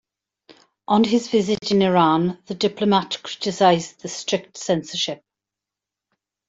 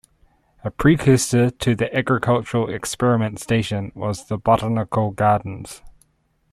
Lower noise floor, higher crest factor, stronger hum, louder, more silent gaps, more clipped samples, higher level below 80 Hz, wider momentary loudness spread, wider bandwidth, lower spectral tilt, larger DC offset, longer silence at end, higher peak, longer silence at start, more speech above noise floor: first, -87 dBFS vs -65 dBFS; about the same, 18 dB vs 16 dB; first, 50 Hz at -45 dBFS vs none; about the same, -21 LUFS vs -20 LUFS; neither; neither; second, -62 dBFS vs -46 dBFS; second, 10 LU vs 14 LU; second, 7.8 kHz vs 14.5 kHz; about the same, -5 dB/octave vs -6 dB/octave; neither; first, 1.35 s vs 0.6 s; about the same, -4 dBFS vs -4 dBFS; second, 0.5 s vs 0.65 s; first, 67 dB vs 45 dB